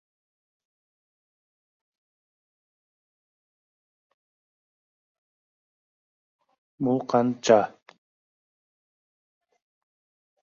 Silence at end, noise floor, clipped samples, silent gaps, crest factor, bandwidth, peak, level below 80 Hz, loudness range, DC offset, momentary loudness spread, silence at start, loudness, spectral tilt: 2.75 s; under -90 dBFS; under 0.1%; none; 28 dB; 7.2 kHz; -4 dBFS; -74 dBFS; 5 LU; under 0.1%; 10 LU; 6.8 s; -23 LUFS; -5 dB/octave